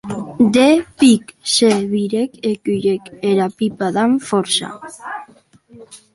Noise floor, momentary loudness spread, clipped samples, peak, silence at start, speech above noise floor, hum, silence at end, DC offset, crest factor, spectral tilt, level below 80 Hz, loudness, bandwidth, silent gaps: -48 dBFS; 17 LU; under 0.1%; -2 dBFS; 0.05 s; 32 dB; none; 0.2 s; under 0.1%; 16 dB; -4.5 dB/octave; -56 dBFS; -16 LUFS; 11.5 kHz; none